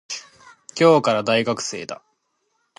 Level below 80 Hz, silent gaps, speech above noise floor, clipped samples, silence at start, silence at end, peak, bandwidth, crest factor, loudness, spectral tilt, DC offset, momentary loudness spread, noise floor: -68 dBFS; none; 52 dB; under 0.1%; 0.1 s; 0.85 s; -2 dBFS; 11.5 kHz; 20 dB; -19 LUFS; -4.5 dB/octave; under 0.1%; 19 LU; -71 dBFS